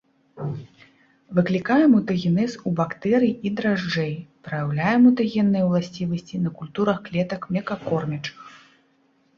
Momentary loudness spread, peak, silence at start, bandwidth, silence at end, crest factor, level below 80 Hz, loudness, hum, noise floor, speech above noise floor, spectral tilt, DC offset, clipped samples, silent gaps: 15 LU; -6 dBFS; 0.35 s; 7.2 kHz; 0.8 s; 16 dB; -60 dBFS; -22 LUFS; none; -63 dBFS; 41 dB; -7.5 dB/octave; under 0.1%; under 0.1%; none